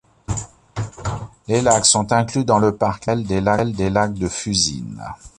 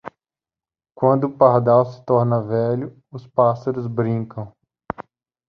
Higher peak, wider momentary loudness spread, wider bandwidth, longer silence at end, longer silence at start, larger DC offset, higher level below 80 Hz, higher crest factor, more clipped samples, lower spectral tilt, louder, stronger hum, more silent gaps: about the same, 0 dBFS vs -2 dBFS; about the same, 16 LU vs 18 LU; first, 11.5 kHz vs 6.2 kHz; second, 0.1 s vs 0.45 s; first, 0.3 s vs 0.05 s; neither; first, -40 dBFS vs -58 dBFS; about the same, 20 dB vs 18 dB; neither; second, -4 dB/octave vs -10.5 dB/octave; about the same, -19 LUFS vs -19 LUFS; neither; neither